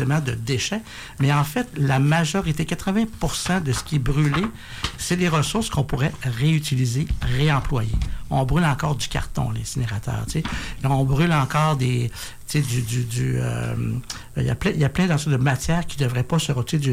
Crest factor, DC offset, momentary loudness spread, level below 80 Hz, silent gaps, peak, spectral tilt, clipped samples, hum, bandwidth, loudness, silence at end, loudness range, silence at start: 12 dB; under 0.1%; 7 LU; -34 dBFS; none; -10 dBFS; -5.5 dB/octave; under 0.1%; none; 16 kHz; -23 LUFS; 0 s; 2 LU; 0 s